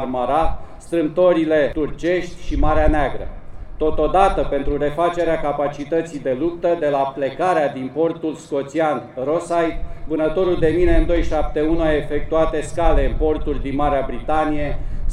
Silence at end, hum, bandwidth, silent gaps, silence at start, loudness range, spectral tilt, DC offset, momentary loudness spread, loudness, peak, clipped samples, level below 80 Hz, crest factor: 0 s; none; 10.5 kHz; none; 0 s; 2 LU; -7 dB/octave; under 0.1%; 8 LU; -20 LUFS; -2 dBFS; under 0.1%; -26 dBFS; 16 dB